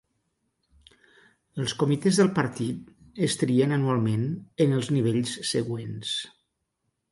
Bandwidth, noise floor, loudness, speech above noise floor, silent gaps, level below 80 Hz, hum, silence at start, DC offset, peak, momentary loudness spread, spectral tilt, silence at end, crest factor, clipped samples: 11.5 kHz; -78 dBFS; -26 LUFS; 53 dB; none; -64 dBFS; none; 1.55 s; under 0.1%; -8 dBFS; 10 LU; -5.5 dB/octave; 0.85 s; 18 dB; under 0.1%